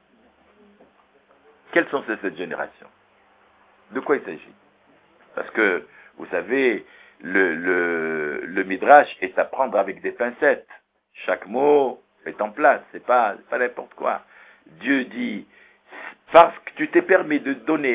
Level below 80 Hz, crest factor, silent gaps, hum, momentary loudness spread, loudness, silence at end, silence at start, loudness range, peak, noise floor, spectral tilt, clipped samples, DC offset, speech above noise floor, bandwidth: -68 dBFS; 22 dB; none; none; 17 LU; -21 LUFS; 0 s; 1.75 s; 9 LU; 0 dBFS; -58 dBFS; -8.5 dB/octave; under 0.1%; under 0.1%; 37 dB; 4 kHz